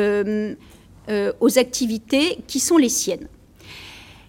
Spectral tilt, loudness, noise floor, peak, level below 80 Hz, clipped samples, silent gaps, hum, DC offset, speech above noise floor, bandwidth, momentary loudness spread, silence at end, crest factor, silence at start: -3 dB/octave; -20 LUFS; -43 dBFS; -4 dBFS; -52 dBFS; under 0.1%; none; none; under 0.1%; 23 dB; 17 kHz; 22 LU; 0.25 s; 18 dB; 0 s